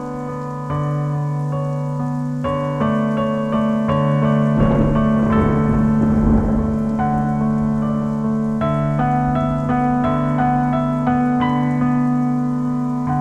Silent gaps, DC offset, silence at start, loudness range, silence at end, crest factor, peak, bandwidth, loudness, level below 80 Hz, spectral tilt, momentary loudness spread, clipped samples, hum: none; under 0.1%; 0 s; 4 LU; 0 s; 14 dB; -4 dBFS; 8.2 kHz; -18 LUFS; -32 dBFS; -9 dB/octave; 6 LU; under 0.1%; none